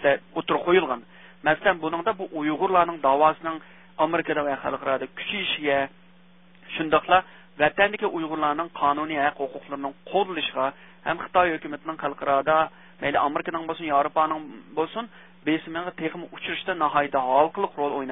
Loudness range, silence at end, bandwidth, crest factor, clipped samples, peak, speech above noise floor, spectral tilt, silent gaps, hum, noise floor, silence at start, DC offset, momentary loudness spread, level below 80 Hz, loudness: 3 LU; 0 s; 3.9 kHz; 22 dB; under 0.1%; -4 dBFS; 31 dB; -9 dB/octave; none; none; -55 dBFS; 0 s; 0.1%; 12 LU; -60 dBFS; -25 LUFS